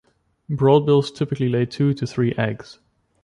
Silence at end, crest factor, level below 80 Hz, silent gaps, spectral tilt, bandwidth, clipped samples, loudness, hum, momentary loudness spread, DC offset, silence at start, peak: 0.5 s; 18 dB; -56 dBFS; none; -8 dB/octave; 10.5 kHz; under 0.1%; -20 LUFS; none; 10 LU; under 0.1%; 0.5 s; -4 dBFS